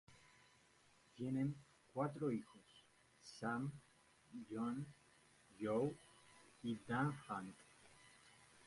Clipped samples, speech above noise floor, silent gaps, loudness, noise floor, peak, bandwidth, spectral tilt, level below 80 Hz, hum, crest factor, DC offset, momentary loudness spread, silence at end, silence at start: under 0.1%; 28 dB; none; -45 LUFS; -72 dBFS; -28 dBFS; 11.5 kHz; -7 dB/octave; -80 dBFS; none; 20 dB; under 0.1%; 23 LU; 0 s; 0.1 s